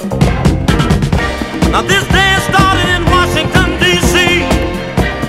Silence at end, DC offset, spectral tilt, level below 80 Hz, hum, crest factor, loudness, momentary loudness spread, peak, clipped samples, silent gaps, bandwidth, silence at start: 0 s; under 0.1%; -4.5 dB/octave; -20 dBFS; none; 12 dB; -11 LUFS; 6 LU; 0 dBFS; 0.2%; none; 16.5 kHz; 0 s